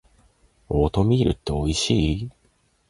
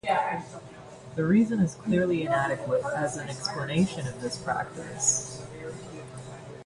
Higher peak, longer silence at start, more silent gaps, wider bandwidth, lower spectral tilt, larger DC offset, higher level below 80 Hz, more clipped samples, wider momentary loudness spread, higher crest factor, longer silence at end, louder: first, -6 dBFS vs -12 dBFS; first, 0.7 s vs 0.05 s; neither; about the same, 11.5 kHz vs 11.5 kHz; first, -6 dB/octave vs -4.5 dB/octave; neither; first, -34 dBFS vs -58 dBFS; neither; second, 8 LU vs 17 LU; about the same, 18 dB vs 16 dB; first, 0.6 s vs 0 s; first, -22 LUFS vs -28 LUFS